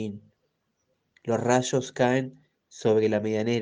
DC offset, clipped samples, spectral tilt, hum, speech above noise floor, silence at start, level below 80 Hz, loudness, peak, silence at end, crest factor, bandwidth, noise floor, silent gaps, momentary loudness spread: under 0.1%; under 0.1%; -5.5 dB/octave; none; 50 dB; 0 s; -68 dBFS; -25 LUFS; -8 dBFS; 0 s; 20 dB; 10 kHz; -75 dBFS; none; 15 LU